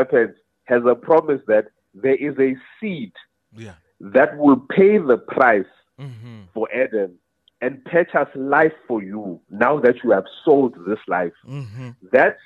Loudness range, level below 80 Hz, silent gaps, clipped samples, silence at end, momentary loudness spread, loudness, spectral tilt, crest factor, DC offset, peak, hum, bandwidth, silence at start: 4 LU; -66 dBFS; none; under 0.1%; 0.1 s; 19 LU; -19 LUFS; -8.5 dB/octave; 16 dB; under 0.1%; -2 dBFS; none; 5 kHz; 0 s